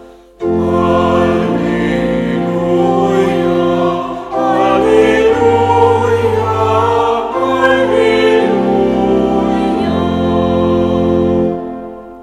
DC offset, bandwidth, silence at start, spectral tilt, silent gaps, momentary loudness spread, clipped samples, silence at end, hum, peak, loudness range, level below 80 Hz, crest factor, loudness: under 0.1%; 12 kHz; 0 s; -7 dB/octave; none; 6 LU; under 0.1%; 0 s; none; 0 dBFS; 2 LU; -36 dBFS; 12 dB; -12 LUFS